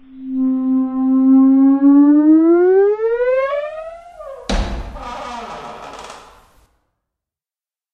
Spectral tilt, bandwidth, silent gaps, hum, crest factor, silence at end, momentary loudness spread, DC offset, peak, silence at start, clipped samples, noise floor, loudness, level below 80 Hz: -7 dB/octave; 8 kHz; none; none; 12 dB; 1.75 s; 22 LU; under 0.1%; -4 dBFS; 0.15 s; under 0.1%; under -90 dBFS; -13 LUFS; -34 dBFS